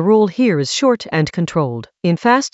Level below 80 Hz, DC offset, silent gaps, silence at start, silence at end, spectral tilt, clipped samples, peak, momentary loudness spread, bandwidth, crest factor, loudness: -54 dBFS; under 0.1%; none; 0 s; 0.05 s; -5.5 dB/octave; under 0.1%; 0 dBFS; 6 LU; 8.2 kHz; 16 dB; -16 LUFS